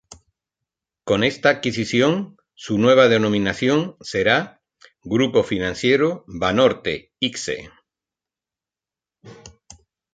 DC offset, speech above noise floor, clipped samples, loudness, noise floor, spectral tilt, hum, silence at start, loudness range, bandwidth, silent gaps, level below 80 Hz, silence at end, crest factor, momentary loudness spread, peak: under 0.1%; 71 dB; under 0.1%; -19 LUFS; -90 dBFS; -5 dB/octave; none; 1.05 s; 6 LU; 9.2 kHz; none; -52 dBFS; 0.65 s; 20 dB; 12 LU; -2 dBFS